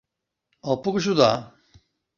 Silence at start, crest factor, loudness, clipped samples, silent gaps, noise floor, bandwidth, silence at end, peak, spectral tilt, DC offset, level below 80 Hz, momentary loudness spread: 0.65 s; 22 dB; -22 LUFS; under 0.1%; none; -78 dBFS; 7.4 kHz; 0.7 s; -4 dBFS; -5.5 dB/octave; under 0.1%; -62 dBFS; 11 LU